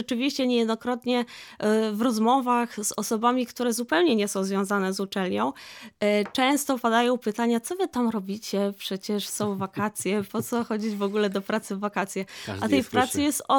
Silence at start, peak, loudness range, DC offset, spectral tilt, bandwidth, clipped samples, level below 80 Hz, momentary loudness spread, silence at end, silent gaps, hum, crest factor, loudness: 0 s; -8 dBFS; 4 LU; under 0.1%; -4 dB/octave; 19.5 kHz; under 0.1%; -68 dBFS; 7 LU; 0 s; none; none; 18 dB; -26 LUFS